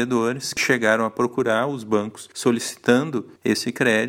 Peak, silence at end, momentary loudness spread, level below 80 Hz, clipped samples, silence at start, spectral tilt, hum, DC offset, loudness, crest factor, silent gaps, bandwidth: -2 dBFS; 0 s; 5 LU; -64 dBFS; under 0.1%; 0 s; -4 dB/octave; none; under 0.1%; -22 LUFS; 18 dB; none; 16.5 kHz